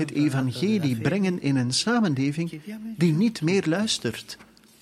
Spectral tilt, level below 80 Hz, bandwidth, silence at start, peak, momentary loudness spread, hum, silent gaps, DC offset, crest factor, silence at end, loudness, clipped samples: -5.5 dB/octave; -64 dBFS; 14 kHz; 0 s; -10 dBFS; 13 LU; none; none; under 0.1%; 16 dB; 0.4 s; -24 LUFS; under 0.1%